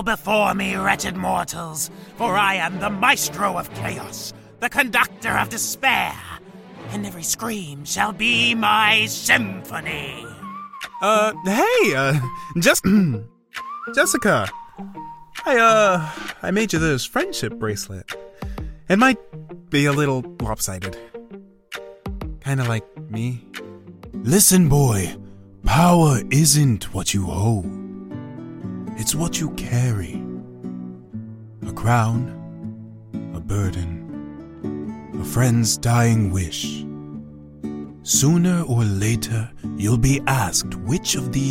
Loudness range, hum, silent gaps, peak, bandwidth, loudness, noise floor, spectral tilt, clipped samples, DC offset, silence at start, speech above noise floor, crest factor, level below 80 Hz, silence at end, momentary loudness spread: 7 LU; none; none; 0 dBFS; 16.5 kHz; -20 LUFS; -42 dBFS; -4 dB/octave; under 0.1%; under 0.1%; 0 s; 23 dB; 20 dB; -40 dBFS; 0 s; 19 LU